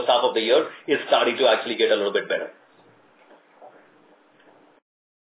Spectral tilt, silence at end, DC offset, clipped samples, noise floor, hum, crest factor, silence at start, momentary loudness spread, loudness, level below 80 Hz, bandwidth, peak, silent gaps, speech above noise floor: -7 dB/octave; 1.65 s; under 0.1%; under 0.1%; -56 dBFS; none; 20 dB; 0 s; 8 LU; -21 LUFS; -88 dBFS; 4 kHz; -4 dBFS; none; 35 dB